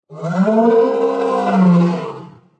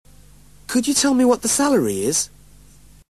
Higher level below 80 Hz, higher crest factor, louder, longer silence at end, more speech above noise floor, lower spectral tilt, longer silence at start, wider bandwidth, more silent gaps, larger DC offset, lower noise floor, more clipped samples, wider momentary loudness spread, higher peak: second, -70 dBFS vs -50 dBFS; about the same, 12 dB vs 16 dB; first, -15 LUFS vs -18 LUFS; second, 0.35 s vs 0.85 s; second, 21 dB vs 31 dB; first, -9 dB/octave vs -3 dB/octave; second, 0.1 s vs 0.7 s; second, 8.4 kHz vs 13 kHz; neither; second, under 0.1% vs 0.3%; second, -34 dBFS vs -48 dBFS; neither; first, 12 LU vs 8 LU; about the same, -2 dBFS vs -4 dBFS